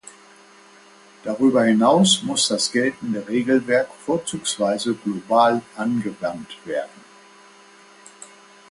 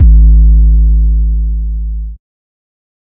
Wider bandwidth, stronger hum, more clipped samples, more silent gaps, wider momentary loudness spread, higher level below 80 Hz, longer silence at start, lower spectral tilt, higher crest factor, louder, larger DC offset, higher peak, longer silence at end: first, 11.5 kHz vs 0.5 kHz; neither; second, under 0.1% vs 0.3%; neither; about the same, 13 LU vs 14 LU; second, -64 dBFS vs -8 dBFS; first, 1.25 s vs 0 s; second, -4 dB/octave vs -15.5 dB/octave; first, 20 dB vs 8 dB; second, -20 LUFS vs -11 LUFS; neither; about the same, -2 dBFS vs 0 dBFS; second, 0.45 s vs 0.85 s